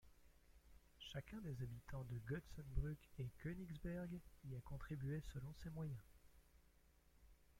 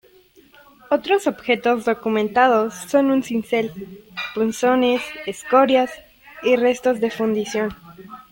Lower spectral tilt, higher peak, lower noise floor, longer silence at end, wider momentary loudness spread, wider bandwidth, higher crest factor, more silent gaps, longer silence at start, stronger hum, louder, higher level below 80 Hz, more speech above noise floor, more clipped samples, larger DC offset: first, -7 dB/octave vs -4.5 dB/octave; second, -30 dBFS vs -4 dBFS; first, -73 dBFS vs -52 dBFS; second, 0 s vs 0.15 s; second, 6 LU vs 13 LU; about the same, 16.5 kHz vs 17 kHz; about the same, 22 dB vs 18 dB; neither; second, 0.05 s vs 0.9 s; neither; second, -52 LUFS vs -20 LUFS; about the same, -60 dBFS vs -58 dBFS; second, 23 dB vs 33 dB; neither; neither